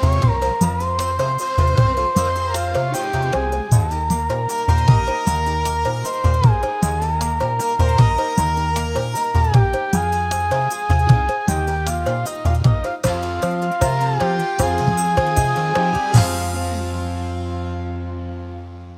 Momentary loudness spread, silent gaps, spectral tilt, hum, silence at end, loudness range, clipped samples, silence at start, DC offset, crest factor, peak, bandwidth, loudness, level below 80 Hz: 8 LU; none; -6 dB/octave; none; 0 s; 1 LU; under 0.1%; 0 s; under 0.1%; 18 dB; -2 dBFS; 16 kHz; -19 LUFS; -30 dBFS